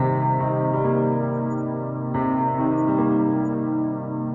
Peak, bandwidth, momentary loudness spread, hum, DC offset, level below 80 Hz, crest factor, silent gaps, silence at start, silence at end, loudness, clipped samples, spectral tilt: -10 dBFS; 3.4 kHz; 6 LU; none; under 0.1%; -56 dBFS; 12 dB; none; 0 s; 0 s; -23 LUFS; under 0.1%; -11.5 dB/octave